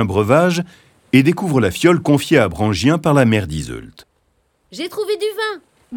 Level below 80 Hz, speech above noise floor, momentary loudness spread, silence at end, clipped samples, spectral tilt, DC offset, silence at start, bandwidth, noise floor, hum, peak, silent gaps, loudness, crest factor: -44 dBFS; 47 dB; 15 LU; 0 s; under 0.1%; -6 dB/octave; under 0.1%; 0 s; 19 kHz; -63 dBFS; none; 0 dBFS; none; -16 LUFS; 16 dB